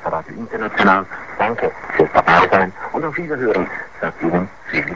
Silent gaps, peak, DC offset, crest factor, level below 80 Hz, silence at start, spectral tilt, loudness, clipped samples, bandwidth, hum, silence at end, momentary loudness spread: none; 0 dBFS; 0.8%; 18 dB; -46 dBFS; 0 s; -6.5 dB/octave; -17 LUFS; under 0.1%; 7.6 kHz; none; 0 s; 13 LU